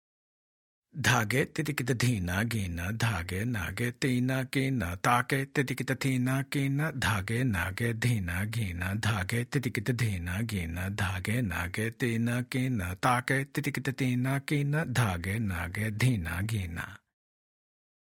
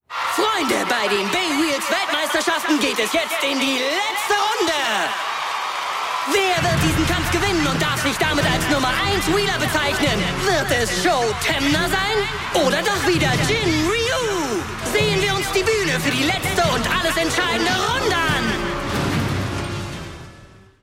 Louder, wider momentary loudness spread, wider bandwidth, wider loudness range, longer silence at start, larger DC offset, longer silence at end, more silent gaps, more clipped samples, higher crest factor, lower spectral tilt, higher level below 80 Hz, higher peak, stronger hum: second, -30 LUFS vs -19 LUFS; about the same, 6 LU vs 5 LU; about the same, 17 kHz vs 16.5 kHz; about the same, 2 LU vs 1 LU; first, 0.95 s vs 0.1 s; neither; first, 1.1 s vs 0.35 s; neither; neither; first, 22 dB vs 14 dB; first, -5.5 dB/octave vs -3.5 dB/octave; second, -56 dBFS vs -38 dBFS; about the same, -8 dBFS vs -6 dBFS; neither